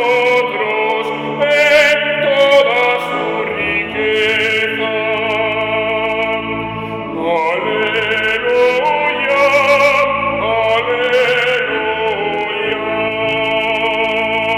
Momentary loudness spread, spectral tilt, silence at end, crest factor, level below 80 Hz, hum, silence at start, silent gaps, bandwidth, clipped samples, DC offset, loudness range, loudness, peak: 7 LU; -4 dB/octave; 0 s; 12 dB; -48 dBFS; none; 0 s; none; 17 kHz; under 0.1%; under 0.1%; 4 LU; -14 LUFS; -2 dBFS